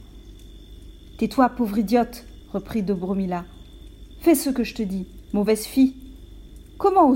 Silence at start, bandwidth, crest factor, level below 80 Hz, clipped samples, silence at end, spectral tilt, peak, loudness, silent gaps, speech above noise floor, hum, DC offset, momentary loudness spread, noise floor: 0 s; 16.5 kHz; 18 dB; -44 dBFS; under 0.1%; 0 s; -6 dB/octave; -6 dBFS; -23 LUFS; none; 22 dB; none; under 0.1%; 13 LU; -43 dBFS